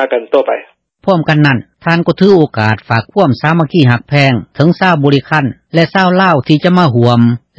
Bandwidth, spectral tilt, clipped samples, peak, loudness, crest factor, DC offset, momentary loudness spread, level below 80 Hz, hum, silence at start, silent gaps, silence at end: 8 kHz; -8 dB/octave; 0.6%; 0 dBFS; -11 LUFS; 10 dB; under 0.1%; 5 LU; -46 dBFS; none; 0 s; none; 0.2 s